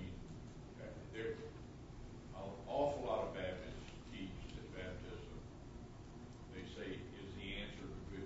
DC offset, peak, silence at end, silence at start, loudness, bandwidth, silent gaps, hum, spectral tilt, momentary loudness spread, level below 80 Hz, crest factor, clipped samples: under 0.1%; -26 dBFS; 0 s; 0 s; -48 LUFS; 7.6 kHz; none; none; -5 dB/octave; 14 LU; -58 dBFS; 20 dB; under 0.1%